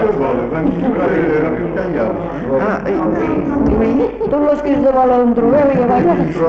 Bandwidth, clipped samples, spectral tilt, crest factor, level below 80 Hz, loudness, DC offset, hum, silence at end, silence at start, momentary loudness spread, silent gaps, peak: 7 kHz; under 0.1%; -9.5 dB/octave; 10 dB; -34 dBFS; -15 LUFS; under 0.1%; none; 0 s; 0 s; 6 LU; none; -4 dBFS